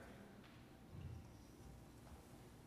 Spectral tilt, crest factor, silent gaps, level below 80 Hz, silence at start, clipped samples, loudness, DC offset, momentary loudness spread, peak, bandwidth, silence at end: -6 dB/octave; 16 dB; none; -66 dBFS; 0 s; under 0.1%; -60 LUFS; under 0.1%; 6 LU; -42 dBFS; 15 kHz; 0 s